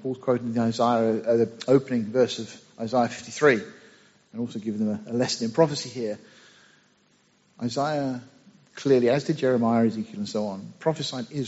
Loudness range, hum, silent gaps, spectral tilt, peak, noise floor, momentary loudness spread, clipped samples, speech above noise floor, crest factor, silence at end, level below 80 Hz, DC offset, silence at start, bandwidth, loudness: 5 LU; none; none; -5 dB/octave; -6 dBFS; -63 dBFS; 12 LU; under 0.1%; 39 dB; 20 dB; 0 s; -68 dBFS; under 0.1%; 0 s; 8 kHz; -25 LUFS